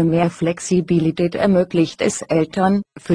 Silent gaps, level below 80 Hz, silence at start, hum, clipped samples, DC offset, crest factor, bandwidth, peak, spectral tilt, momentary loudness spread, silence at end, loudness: none; -48 dBFS; 0 s; none; under 0.1%; under 0.1%; 14 dB; 10.5 kHz; -2 dBFS; -6 dB/octave; 4 LU; 0 s; -18 LUFS